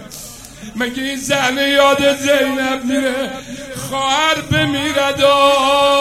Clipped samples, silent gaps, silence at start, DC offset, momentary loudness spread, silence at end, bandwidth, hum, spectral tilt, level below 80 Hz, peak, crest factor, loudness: under 0.1%; none; 0 s; under 0.1%; 17 LU; 0 s; 15.5 kHz; none; -3.5 dB/octave; -46 dBFS; 0 dBFS; 16 dB; -15 LUFS